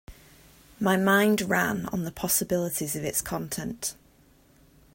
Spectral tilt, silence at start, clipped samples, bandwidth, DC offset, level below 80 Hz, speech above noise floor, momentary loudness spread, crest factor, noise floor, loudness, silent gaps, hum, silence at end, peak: -4 dB/octave; 0.1 s; under 0.1%; 16.5 kHz; under 0.1%; -54 dBFS; 33 dB; 11 LU; 22 dB; -59 dBFS; -26 LUFS; none; none; 1 s; -8 dBFS